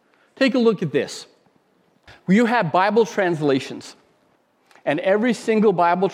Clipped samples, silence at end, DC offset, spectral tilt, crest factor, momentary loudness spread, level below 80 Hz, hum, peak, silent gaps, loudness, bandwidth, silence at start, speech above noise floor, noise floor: under 0.1%; 0 s; under 0.1%; -6 dB/octave; 16 dB; 13 LU; -70 dBFS; none; -4 dBFS; none; -19 LUFS; 12.5 kHz; 0.4 s; 43 dB; -62 dBFS